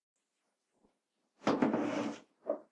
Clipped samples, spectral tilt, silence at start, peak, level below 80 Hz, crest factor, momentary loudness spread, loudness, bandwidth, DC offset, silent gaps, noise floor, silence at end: under 0.1%; -6 dB/octave; 1.45 s; -16 dBFS; -82 dBFS; 22 dB; 10 LU; -36 LUFS; 10.5 kHz; under 0.1%; none; -84 dBFS; 0.1 s